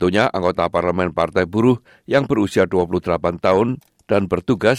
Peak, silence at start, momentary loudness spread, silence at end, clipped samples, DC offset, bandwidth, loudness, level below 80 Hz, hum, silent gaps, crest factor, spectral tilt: -4 dBFS; 0 s; 4 LU; 0 s; under 0.1%; under 0.1%; 12.5 kHz; -19 LUFS; -50 dBFS; none; none; 14 dB; -7 dB/octave